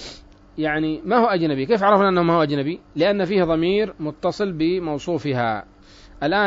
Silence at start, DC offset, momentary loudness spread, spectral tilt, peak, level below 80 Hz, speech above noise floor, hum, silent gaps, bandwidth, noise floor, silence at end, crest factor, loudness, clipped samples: 0 s; under 0.1%; 10 LU; -7 dB/octave; -4 dBFS; -48 dBFS; 23 dB; none; none; 7.8 kHz; -43 dBFS; 0 s; 18 dB; -21 LUFS; under 0.1%